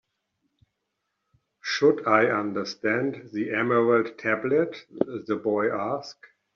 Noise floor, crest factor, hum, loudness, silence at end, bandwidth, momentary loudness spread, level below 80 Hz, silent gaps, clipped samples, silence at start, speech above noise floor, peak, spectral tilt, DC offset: -80 dBFS; 20 dB; none; -25 LUFS; 0.45 s; 7.2 kHz; 10 LU; -72 dBFS; none; under 0.1%; 1.65 s; 55 dB; -6 dBFS; -4 dB/octave; under 0.1%